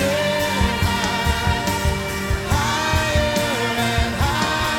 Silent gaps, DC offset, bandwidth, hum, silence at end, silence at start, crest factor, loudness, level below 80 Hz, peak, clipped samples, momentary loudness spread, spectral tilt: none; under 0.1%; 18 kHz; none; 0 s; 0 s; 14 dB; -20 LUFS; -28 dBFS; -6 dBFS; under 0.1%; 3 LU; -4 dB/octave